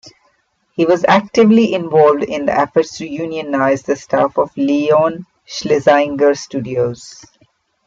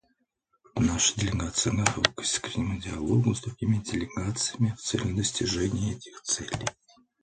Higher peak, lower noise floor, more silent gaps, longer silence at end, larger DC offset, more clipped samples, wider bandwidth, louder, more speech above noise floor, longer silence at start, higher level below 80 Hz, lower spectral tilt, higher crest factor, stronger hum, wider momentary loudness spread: about the same, 0 dBFS vs 0 dBFS; second, -61 dBFS vs -74 dBFS; neither; first, 0.75 s vs 0.5 s; neither; neither; second, 7.8 kHz vs 10 kHz; first, -15 LUFS vs -28 LUFS; about the same, 47 dB vs 46 dB; second, 0.05 s vs 0.75 s; second, -56 dBFS vs -46 dBFS; first, -5.5 dB/octave vs -4 dB/octave; second, 14 dB vs 28 dB; neither; first, 11 LU vs 8 LU